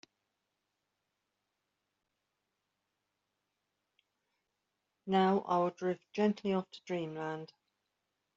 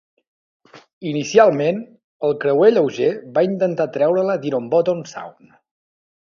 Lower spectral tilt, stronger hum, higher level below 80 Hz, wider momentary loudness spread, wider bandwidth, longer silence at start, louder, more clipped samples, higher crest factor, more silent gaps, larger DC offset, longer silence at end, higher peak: about the same, -5.5 dB/octave vs -6 dB/octave; neither; second, -82 dBFS vs -68 dBFS; about the same, 13 LU vs 14 LU; about the same, 7.6 kHz vs 7.4 kHz; first, 5.05 s vs 0.75 s; second, -34 LUFS vs -18 LUFS; neither; about the same, 22 dB vs 20 dB; second, none vs 0.93-1.01 s, 2.04-2.20 s; neither; second, 0.9 s vs 1.1 s; second, -18 dBFS vs 0 dBFS